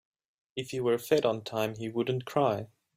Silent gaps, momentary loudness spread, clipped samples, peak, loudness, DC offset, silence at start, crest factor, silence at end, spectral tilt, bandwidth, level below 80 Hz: none; 10 LU; under 0.1%; -12 dBFS; -30 LUFS; under 0.1%; 0.55 s; 20 dB; 0.3 s; -6 dB/octave; 16 kHz; -70 dBFS